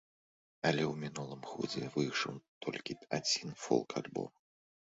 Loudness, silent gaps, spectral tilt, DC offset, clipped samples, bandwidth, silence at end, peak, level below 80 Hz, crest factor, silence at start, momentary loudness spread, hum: -37 LUFS; 2.48-2.61 s; -3.5 dB/octave; under 0.1%; under 0.1%; 7.6 kHz; 0.65 s; -16 dBFS; -74 dBFS; 22 dB; 0.65 s; 10 LU; none